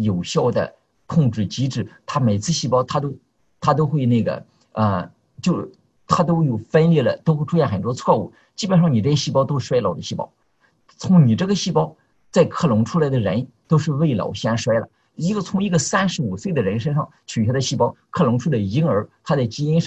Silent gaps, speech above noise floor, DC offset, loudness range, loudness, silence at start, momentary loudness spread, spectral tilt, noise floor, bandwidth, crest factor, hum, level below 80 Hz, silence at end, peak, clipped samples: none; 41 dB; under 0.1%; 3 LU; -20 LUFS; 0 s; 9 LU; -6.5 dB/octave; -60 dBFS; 8.4 kHz; 18 dB; none; -50 dBFS; 0 s; -2 dBFS; under 0.1%